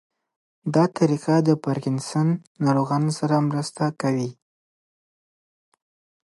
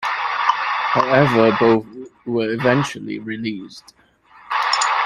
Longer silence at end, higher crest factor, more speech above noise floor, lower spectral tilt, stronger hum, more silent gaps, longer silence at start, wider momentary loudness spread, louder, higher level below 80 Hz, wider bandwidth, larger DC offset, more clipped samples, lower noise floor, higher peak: first, 1.95 s vs 0 s; about the same, 18 dB vs 18 dB; first, over 68 dB vs 31 dB; first, -7 dB/octave vs -5 dB/octave; neither; first, 2.47-2.55 s vs none; first, 0.65 s vs 0 s; second, 6 LU vs 14 LU; second, -23 LUFS vs -18 LUFS; second, -70 dBFS vs -56 dBFS; second, 11.5 kHz vs 13.5 kHz; neither; neither; first, under -90 dBFS vs -49 dBFS; second, -6 dBFS vs -2 dBFS